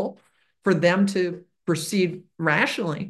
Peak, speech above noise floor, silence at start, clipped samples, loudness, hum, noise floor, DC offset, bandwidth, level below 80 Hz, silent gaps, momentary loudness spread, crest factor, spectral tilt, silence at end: -6 dBFS; 38 dB; 0 s; under 0.1%; -23 LUFS; none; -61 dBFS; under 0.1%; 12.5 kHz; -68 dBFS; none; 9 LU; 18 dB; -5.5 dB/octave; 0 s